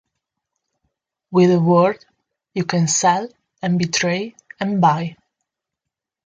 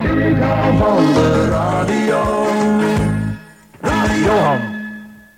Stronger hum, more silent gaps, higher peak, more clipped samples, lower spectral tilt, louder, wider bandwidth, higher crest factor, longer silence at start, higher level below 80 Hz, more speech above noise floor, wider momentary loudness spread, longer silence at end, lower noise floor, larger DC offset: neither; neither; about the same, -2 dBFS vs -2 dBFS; neither; second, -5 dB/octave vs -6.5 dB/octave; second, -18 LUFS vs -15 LUFS; second, 9.4 kHz vs 16 kHz; about the same, 18 dB vs 14 dB; first, 1.3 s vs 0 s; second, -62 dBFS vs -32 dBFS; first, 67 dB vs 23 dB; first, 15 LU vs 12 LU; first, 1.1 s vs 0.2 s; first, -84 dBFS vs -36 dBFS; neither